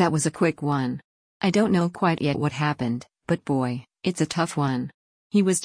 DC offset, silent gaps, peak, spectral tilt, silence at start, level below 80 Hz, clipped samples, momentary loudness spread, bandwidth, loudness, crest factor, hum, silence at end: under 0.1%; 1.04-1.40 s, 4.94-5.30 s; -8 dBFS; -5.5 dB/octave; 0 s; -60 dBFS; under 0.1%; 8 LU; 10.5 kHz; -25 LUFS; 16 dB; none; 0 s